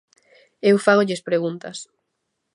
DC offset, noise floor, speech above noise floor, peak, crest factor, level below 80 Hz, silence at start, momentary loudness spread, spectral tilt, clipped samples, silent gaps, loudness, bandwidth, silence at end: under 0.1%; -76 dBFS; 57 dB; -2 dBFS; 20 dB; -74 dBFS; 0.65 s; 18 LU; -5.5 dB/octave; under 0.1%; none; -19 LUFS; 11.5 kHz; 0.7 s